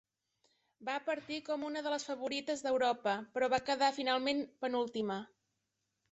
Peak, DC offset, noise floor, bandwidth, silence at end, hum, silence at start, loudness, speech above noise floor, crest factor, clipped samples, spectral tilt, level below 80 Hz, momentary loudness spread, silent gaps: -18 dBFS; under 0.1%; -85 dBFS; 8.2 kHz; 0.85 s; none; 0.8 s; -36 LUFS; 50 dB; 18 dB; under 0.1%; -3.5 dB/octave; -76 dBFS; 7 LU; none